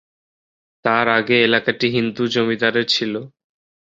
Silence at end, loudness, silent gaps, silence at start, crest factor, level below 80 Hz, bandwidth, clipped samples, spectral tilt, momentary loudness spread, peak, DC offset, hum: 0.7 s; -18 LUFS; none; 0.85 s; 18 dB; -62 dBFS; 7.8 kHz; under 0.1%; -5 dB/octave; 7 LU; -2 dBFS; under 0.1%; none